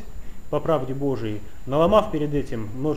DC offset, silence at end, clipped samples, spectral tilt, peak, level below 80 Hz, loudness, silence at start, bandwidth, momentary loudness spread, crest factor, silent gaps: 3%; 0 s; under 0.1%; -7.5 dB/octave; -4 dBFS; -40 dBFS; -24 LUFS; 0 s; 15.5 kHz; 14 LU; 20 dB; none